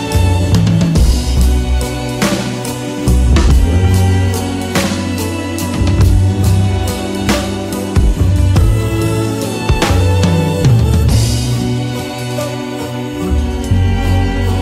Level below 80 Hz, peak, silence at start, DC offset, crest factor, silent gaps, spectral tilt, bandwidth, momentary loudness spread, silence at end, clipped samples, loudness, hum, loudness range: -18 dBFS; 0 dBFS; 0 s; under 0.1%; 12 dB; none; -6 dB/octave; 16 kHz; 8 LU; 0 s; under 0.1%; -14 LUFS; none; 2 LU